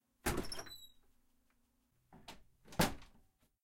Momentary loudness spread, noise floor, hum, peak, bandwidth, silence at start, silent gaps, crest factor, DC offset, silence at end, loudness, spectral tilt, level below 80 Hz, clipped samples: 22 LU; -77 dBFS; none; -18 dBFS; 16 kHz; 0.25 s; none; 26 dB; under 0.1%; 0.55 s; -40 LUFS; -4 dB/octave; -56 dBFS; under 0.1%